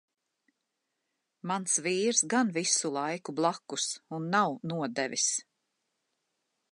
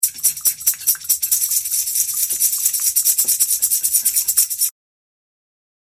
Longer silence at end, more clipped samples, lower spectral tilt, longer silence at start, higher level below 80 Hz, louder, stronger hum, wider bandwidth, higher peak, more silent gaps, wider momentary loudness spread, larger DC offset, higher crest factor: about the same, 1.3 s vs 1.3 s; neither; first, -2.5 dB/octave vs 3.5 dB/octave; first, 1.45 s vs 0 s; second, -84 dBFS vs -60 dBFS; second, -29 LUFS vs -15 LUFS; neither; second, 11.5 kHz vs 17.5 kHz; second, -12 dBFS vs 0 dBFS; neither; first, 8 LU vs 3 LU; neither; about the same, 20 dB vs 20 dB